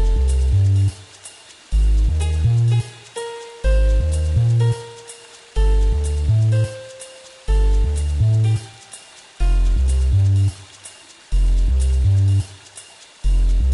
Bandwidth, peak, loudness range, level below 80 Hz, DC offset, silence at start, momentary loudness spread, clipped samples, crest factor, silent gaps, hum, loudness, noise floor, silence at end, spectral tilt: 11.5 kHz; -8 dBFS; 2 LU; -20 dBFS; under 0.1%; 0 s; 21 LU; under 0.1%; 10 dB; none; none; -19 LUFS; -42 dBFS; 0 s; -6.5 dB/octave